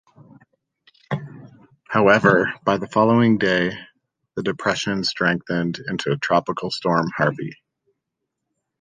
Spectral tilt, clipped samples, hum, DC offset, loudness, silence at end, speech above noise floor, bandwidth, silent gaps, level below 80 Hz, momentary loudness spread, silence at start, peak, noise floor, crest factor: -6 dB/octave; under 0.1%; none; under 0.1%; -20 LUFS; 1.3 s; 60 dB; 9.6 kHz; none; -56 dBFS; 14 LU; 1.1 s; -2 dBFS; -80 dBFS; 20 dB